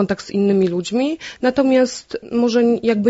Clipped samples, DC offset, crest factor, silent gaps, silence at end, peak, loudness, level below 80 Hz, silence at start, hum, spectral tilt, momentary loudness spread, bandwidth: under 0.1%; under 0.1%; 14 dB; none; 0 s; -4 dBFS; -18 LUFS; -54 dBFS; 0 s; none; -6 dB/octave; 6 LU; 8 kHz